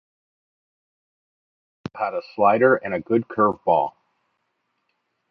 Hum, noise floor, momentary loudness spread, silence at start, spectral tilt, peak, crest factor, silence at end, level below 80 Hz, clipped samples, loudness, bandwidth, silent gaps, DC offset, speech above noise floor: none; -74 dBFS; 12 LU; 1.95 s; -9 dB/octave; -4 dBFS; 22 dB; 1.4 s; -64 dBFS; under 0.1%; -21 LUFS; 6 kHz; none; under 0.1%; 54 dB